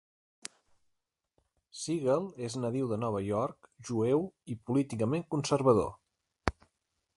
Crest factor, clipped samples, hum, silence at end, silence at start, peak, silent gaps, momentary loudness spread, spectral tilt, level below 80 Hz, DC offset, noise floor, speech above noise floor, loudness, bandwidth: 28 dB; under 0.1%; none; 0.65 s; 1.75 s; -6 dBFS; none; 19 LU; -6.5 dB/octave; -56 dBFS; under 0.1%; -82 dBFS; 51 dB; -32 LUFS; 11.5 kHz